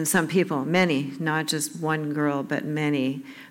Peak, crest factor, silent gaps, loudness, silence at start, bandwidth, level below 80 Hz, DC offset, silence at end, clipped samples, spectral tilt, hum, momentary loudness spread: -8 dBFS; 16 dB; none; -25 LUFS; 0 s; 17 kHz; -72 dBFS; under 0.1%; 0 s; under 0.1%; -4.5 dB/octave; none; 6 LU